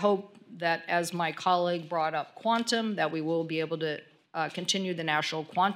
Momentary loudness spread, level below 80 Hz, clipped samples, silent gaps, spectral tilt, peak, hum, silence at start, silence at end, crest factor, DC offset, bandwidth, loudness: 6 LU; -84 dBFS; under 0.1%; none; -4 dB/octave; -12 dBFS; none; 0 s; 0 s; 18 dB; under 0.1%; 17.5 kHz; -30 LUFS